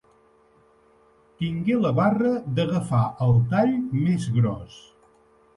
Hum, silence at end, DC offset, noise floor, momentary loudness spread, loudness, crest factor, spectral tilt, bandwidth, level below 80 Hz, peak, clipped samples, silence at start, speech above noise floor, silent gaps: none; 0.75 s; under 0.1%; -58 dBFS; 8 LU; -23 LUFS; 16 dB; -8.5 dB/octave; 11 kHz; -52 dBFS; -8 dBFS; under 0.1%; 1.4 s; 36 dB; none